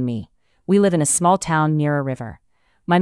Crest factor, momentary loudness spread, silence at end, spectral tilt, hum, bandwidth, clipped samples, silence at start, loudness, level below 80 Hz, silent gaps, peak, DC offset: 14 dB; 18 LU; 0 s; -5.5 dB/octave; none; 12 kHz; under 0.1%; 0 s; -18 LUFS; -54 dBFS; none; -6 dBFS; under 0.1%